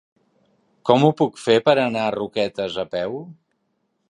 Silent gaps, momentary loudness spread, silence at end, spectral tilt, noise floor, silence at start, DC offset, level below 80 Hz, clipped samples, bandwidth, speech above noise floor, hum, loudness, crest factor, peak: none; 11 LU; 0.75 s; -6 dB/octave; -71 dBFS; 0.85 s; under 0.1%; -62 dBFS; under 0.1%; 11 kHz; 51 dB; none; -20 LUFS; 20 dB; -2 dBFS